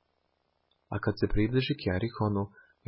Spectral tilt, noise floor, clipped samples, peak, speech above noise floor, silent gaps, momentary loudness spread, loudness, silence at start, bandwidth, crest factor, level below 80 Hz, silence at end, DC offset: -11 dB/octave; -76 dBFS; under 0.1%; -14 dBFS; 46 dB; none; 7 LU; -31 LUFS; 0.9 s; 5.8 kHz; 18 dB; -44 dBFS; 0.4 s; under 0.1%